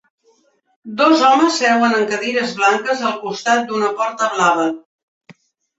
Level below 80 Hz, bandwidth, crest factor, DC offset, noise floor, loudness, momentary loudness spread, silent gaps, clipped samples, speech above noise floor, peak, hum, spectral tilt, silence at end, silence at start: -68 dBFS; 8.2 kHz; 16 dB; under 0.1%; -58 dBFS; -16 LUFS; 9 LU; 4.85-5.21 s; under 0.1%; 43 dB; -2 dBFS; none; -3 dB/octave; 0.45 s; 0.85 s